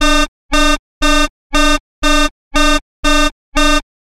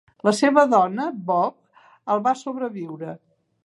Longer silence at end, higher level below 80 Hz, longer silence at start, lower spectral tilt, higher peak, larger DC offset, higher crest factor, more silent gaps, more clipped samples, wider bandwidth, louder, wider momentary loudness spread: second, 0.2 s vs 0.5 s; first, -18 dBFS vs -76 dBFS; second, 0 s vs 0.25 s; second, -2.5 dB/octave vs -5 dB/octave; about the same, -2 dBFS vs -2 dBFS; neither; second, 10 dB vs 20 dB; first, 0.28-0.49 s, 0.79-1.01 s, 1.30-1.50 s, 1.80-2.02 s, 2.31-2.51 s, 2.81-3.03 s, 3.32-3.52 s vs none; neither; first, 15 kHz vs 11.5 kHz; first, -14 LUFS vs -21 LUFS; second, 3 LU vs 17 LU